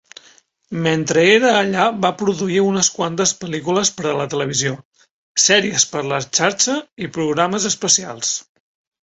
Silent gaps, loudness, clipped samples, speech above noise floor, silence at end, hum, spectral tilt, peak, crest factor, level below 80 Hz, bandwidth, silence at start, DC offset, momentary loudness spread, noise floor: 4.85-4.92 s, 5.11-5.35 s, 6.92-6.96 s; -17 LUFS; under 0.1%; 34 dB; 0.6 s; none; -2.5 dB/octave; 0 dBFS; 18 dB; -58 dBFS; 8.4 kHz; 0.7 s; under 0.1%; 10 LU; -52 dBFS